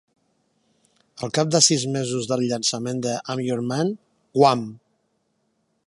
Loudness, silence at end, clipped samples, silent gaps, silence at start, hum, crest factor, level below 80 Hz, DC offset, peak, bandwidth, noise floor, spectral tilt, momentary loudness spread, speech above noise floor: -22 LUFS; 1.1 s; under 0.1%; none; 1.15 s; none; 22 dB; -68 dBFS; under 0.1%; -2 dBFS; 11.5 kHz; -70 dBFS; -4 dB/octave; 11 LU; 49 dB